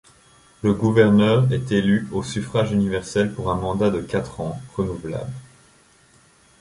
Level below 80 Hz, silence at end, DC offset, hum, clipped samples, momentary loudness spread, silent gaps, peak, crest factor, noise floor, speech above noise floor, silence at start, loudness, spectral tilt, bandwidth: -46 dBFS; 1.15 s; under 0.1%; none; under 0.1%; 14 LU; none; -2 dBFS; 18 dB; -55 dBFS; 34 dB; 0.65 s; -21 LUFS; -7 dB/octave; 11.5 kHz